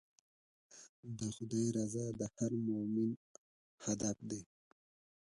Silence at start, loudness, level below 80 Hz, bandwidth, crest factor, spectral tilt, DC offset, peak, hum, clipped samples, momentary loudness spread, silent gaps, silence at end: 0.7 s; -40 LUFS; -72 dBFS; 11.5 kHz; 18 dB; -6 dB/octave; under 0.1%; -24 dBFS; none; under 0.1%; 13 LU; 0.89-1.03 s, 3.17-3.78 s; 0.75 s